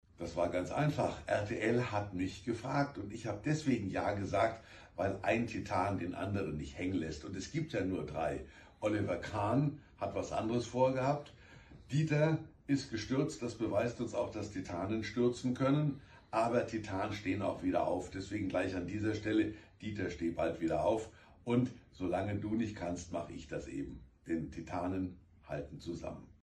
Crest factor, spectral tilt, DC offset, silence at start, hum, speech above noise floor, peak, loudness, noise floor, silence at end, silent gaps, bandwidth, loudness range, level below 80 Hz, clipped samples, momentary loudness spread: 18 dB; -6.5 dB/octave; under 0.1%; 0.2 s; none; 21 dB; -18 dBFS; -36 LUFS; -56 dBFS; 0.15 s; none; 10 kHz; 3 LU; -58 dBFS; under 0.1%; 10 LU